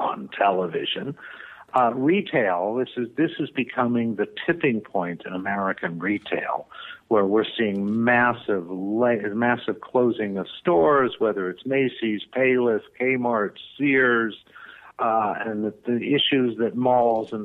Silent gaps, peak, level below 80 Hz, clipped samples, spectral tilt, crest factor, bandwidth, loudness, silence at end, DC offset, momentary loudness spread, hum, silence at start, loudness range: none; -6 dBFS; -66 dBFS; under 0.1%; -8 dB/octave; 16 dB; 4.2 kHz; -23 LUFS; 0 s; under 0.1%; 9 LU; none; 0 s; 3 LU